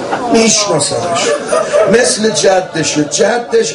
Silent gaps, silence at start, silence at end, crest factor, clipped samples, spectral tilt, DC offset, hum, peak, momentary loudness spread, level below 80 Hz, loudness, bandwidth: none; 0 s; 0 s; 12 dB; under 0.1%; -3 dB/octave; under 0.1%; none; 0 dBFS; 5 LU; -48 dBFS; -11 LUFS; 11.5 kHz